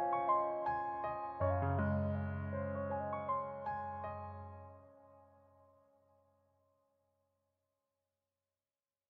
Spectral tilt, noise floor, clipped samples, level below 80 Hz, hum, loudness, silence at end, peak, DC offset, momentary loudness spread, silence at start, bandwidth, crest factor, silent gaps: -8 dB/octave; under -90 dBFS; under 0.1%; -66 dBFS; none; -39 LUFS; 3.85 s; -22 dBFS; under 0.1%; 14 LU; 0 s; 4.5 kHz; 18 dB; none